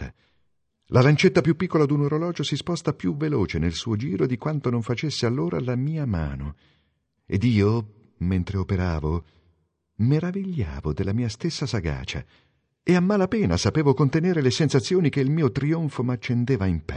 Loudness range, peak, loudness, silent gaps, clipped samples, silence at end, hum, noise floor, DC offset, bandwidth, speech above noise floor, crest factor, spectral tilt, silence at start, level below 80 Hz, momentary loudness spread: 5 LU; -6 dBFS; -24 LUFS; none; under 0.1%; 0 s; none; -71 dBFS; under 0.1%; 10 kHz; 48 dB; 18 dB; -6.5 dB/octave; 0 s; -40 dBFS; 9 LU